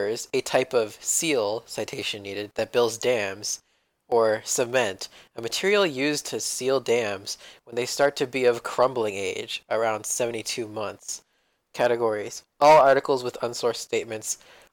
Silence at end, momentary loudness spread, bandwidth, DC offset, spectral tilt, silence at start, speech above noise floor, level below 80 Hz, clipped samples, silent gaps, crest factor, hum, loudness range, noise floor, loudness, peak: 0.4 s; 11 LU; 19 kHz; under 0.1%; -2.5 dB/octave; 0 s; 46 dB; -66 dBFS; under 0.1%; none; 18 dB; none; 4 LU; -71 dBFS; -25 LUFS; -8 dBFS